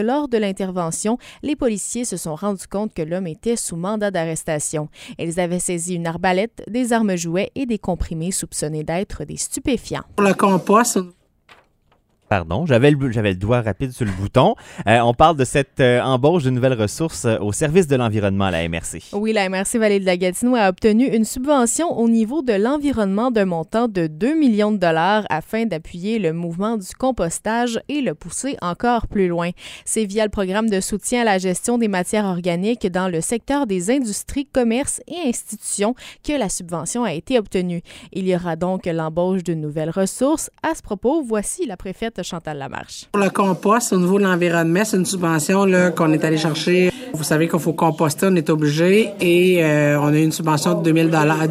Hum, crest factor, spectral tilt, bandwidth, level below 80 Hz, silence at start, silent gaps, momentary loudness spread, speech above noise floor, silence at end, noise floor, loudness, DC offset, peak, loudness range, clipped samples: none; 18 dB; -5 dB/octave; 16 kHz; -44 dBFS; 0 s; none; 9 LU; 42 dB; 0 s; -61 dBFS; -19 LUFS; under 0.1%; 0 dBFS; 6 LU; under 0.1%